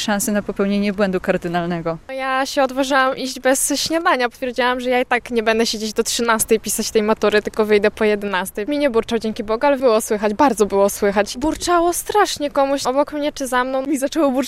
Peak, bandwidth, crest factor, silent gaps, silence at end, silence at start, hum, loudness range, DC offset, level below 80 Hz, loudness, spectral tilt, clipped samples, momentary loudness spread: -2 dBFS; 16 kHz; 16 dB; none; 0 s; 0 s; none; 1 LU; under 0.1%; -46 dBFS; -18 LUFS; -3.5 dB/octave; under 0.1%; 5 LU